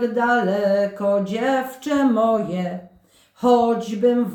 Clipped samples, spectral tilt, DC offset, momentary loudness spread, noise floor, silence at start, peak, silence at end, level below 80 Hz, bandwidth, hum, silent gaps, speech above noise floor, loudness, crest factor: under 0.1%; -6.5 dB/octave; under 0.1%; 7 LU; -53 dBFS; 0 s; -4 dBFS; 0 s; -62 dBFS; 19.5 kHz; none; none; 34 dB; -20 LUFS; 16 dB